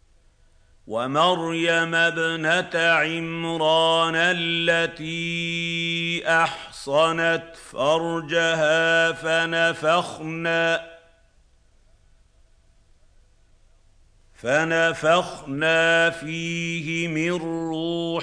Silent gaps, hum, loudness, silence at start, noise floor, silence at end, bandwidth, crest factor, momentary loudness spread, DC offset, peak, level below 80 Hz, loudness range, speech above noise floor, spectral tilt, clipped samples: none; none; -22 LUFS; 0.85 s; -58 dBFS; 0 s; 10.5 kHz; 18 dB; 9 LU; under 0.1%; -6 dBFS; -58 dBFS; 7 LU; 35 dB; -4 dB/octave; under 0.1%